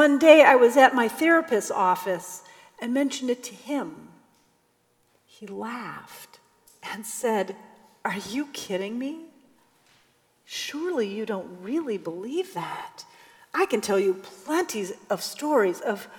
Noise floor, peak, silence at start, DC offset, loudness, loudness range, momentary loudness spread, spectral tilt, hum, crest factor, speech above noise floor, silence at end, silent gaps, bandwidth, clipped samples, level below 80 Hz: -67 dBFS; -2 dBFS; 0 s; under 0.1%; -24 LUFS; 11 LU; 20 LU; -3.5 dB/octave; none; 24 dB; 43 dB; 0 s; none; 19.5 kHz; under 0.1%; -76 dBFS